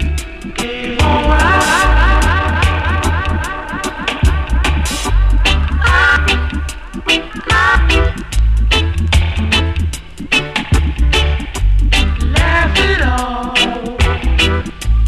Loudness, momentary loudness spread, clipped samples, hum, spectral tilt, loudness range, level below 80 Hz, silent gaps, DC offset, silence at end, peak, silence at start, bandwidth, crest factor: -14 LUFS; 9 LU; under 0.1%; none; -4.5 dB/octave; 2 LU; -16 dBFS; none; under 0.1%; 0 s; 0 dBFS; 0 s; 13.5 kHz; 12 dB